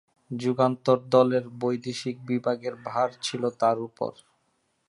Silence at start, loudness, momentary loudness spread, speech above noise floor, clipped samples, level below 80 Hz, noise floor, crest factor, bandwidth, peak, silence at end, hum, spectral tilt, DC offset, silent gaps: 0.3 s; -26 LUFS; 12 LU; 46 dB; under 0.1%; -74 dBFS; -72 dBFS; 20 dB; 11.5 kHz; -6 dBFS; 0.75 s; none; -6 dB/octave; under 0.1%; none